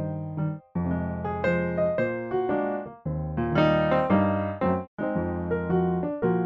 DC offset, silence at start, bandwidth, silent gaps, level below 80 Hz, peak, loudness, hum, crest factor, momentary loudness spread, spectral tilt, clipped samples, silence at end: under 0.1%; 0 s; 5.6 kHz; 4.87-4.97 s; -48 dBFS; -10 dBFS; -27 LUFS; none; 16 dB; 9 LU; -9.5 dB/octave; under 0.1%; 0 s